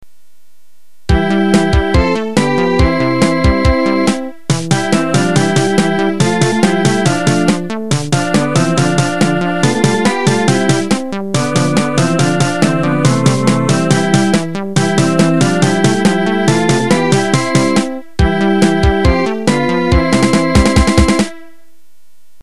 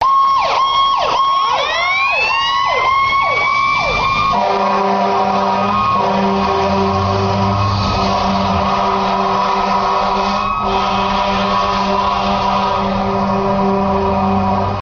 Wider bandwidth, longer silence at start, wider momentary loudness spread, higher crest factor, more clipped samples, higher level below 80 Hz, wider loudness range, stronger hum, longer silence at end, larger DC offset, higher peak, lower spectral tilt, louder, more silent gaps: first, 12.5 kHz vs 7 kHz; first, 1.1 s vs 0 s; about the same, 4 LU vs 3 LU; about the same, 12 dB vs 12 dB; neither; first, -24 dBFS vs -34 dBFS; about the same, 1 LU vs 2 LU; neither; first, 1 s vs 0 s; first, 3% vs under 0.1%; about the same, 0 dBFS vs -2 dBFS; about the same, -5.5 dB/octave vs -5.5 dB/octave; about the same, -13 LUFS vs -14 LUFS; neither